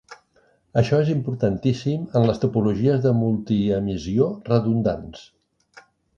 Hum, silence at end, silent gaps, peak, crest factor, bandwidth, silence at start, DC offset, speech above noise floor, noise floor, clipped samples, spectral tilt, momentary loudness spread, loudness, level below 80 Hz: none; 0.95 s; none; -4 dBFS; 18 dB; 7.4 kHz; 0.1 s; under 0.1%; 41 dB; -61 dBFS; under 0.1%; -8.5 dB/octave; 5 LU; -22 LUFS; -48 dBFS